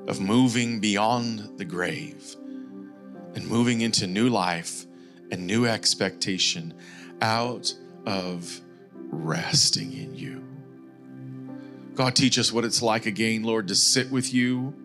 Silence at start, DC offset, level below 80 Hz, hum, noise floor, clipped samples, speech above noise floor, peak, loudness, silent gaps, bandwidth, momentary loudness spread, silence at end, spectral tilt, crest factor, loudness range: 0 s; under 0.1%; -70 dBFS; none; -46 dBFS; under 0.1%; 21 dB; -8 dBFS; -24 LUFS; none; 15 kHz; 21 LU; 0 s; -3.5 dB/octave; 20 dB; 5 LU